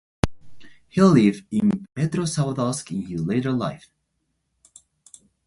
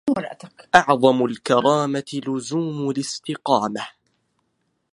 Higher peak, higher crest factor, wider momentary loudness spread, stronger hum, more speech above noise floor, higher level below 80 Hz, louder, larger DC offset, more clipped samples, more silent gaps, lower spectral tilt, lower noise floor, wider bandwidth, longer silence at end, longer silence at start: about the same, 0 dBFS vs 0 dBFS; about the same, 22 dB vs 22 dB; about the same, 12 LU vs 12 LU; neither; about the same, 53 dB vs 51 dB; first, -48 dBFS vs -62 dBFS; about the same, -22 LUFS vs -21 LUFS; neither; neither; neither; first, -6.5 dB/octave vs -5 dB/octave; about the same, -74 dBFS vs -71 dBFS; about the same, 11.5 kHz vs 11.5 kHz; first, 1.7 s vs 1.05 s; first, 0.25 s vs 0.05 s